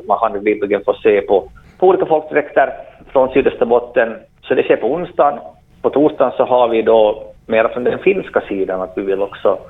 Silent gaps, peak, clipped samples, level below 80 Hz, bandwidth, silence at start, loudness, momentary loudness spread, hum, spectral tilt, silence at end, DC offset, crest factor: none; 0 dBFS; under 0.1%; -48 dBFS; 4 kHz; 0 s; -15 LUFS; 7 LU; none; -8.5 dB/octave; 0 s; under 0.1%; 16 dB